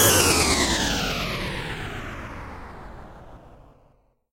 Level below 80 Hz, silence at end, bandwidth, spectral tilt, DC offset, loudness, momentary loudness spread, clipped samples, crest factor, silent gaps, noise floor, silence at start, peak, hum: -38 dBFS; 0.8 s; 16 kHz; -2.5 dB/octave; under 0.1%; -22 LUFS; 24 LU; under 0.1%; 22 dB; none; -60 dBFS; 0 s; -4 dBFS; none